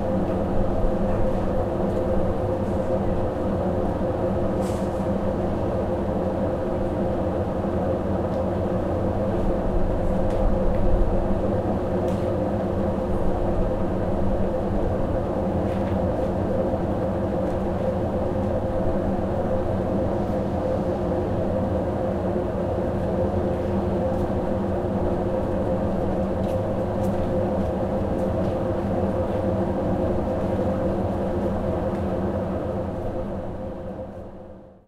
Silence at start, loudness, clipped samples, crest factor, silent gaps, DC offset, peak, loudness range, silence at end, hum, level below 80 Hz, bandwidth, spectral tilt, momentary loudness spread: 0 s; -25 LUFS; under 0.1%; 16 dB; none; under 0.1%; -8 dBFS; 1 LU; 0.15 s; none; -32 dBFS; 12 kHz; -9 dB/octave; 1 LU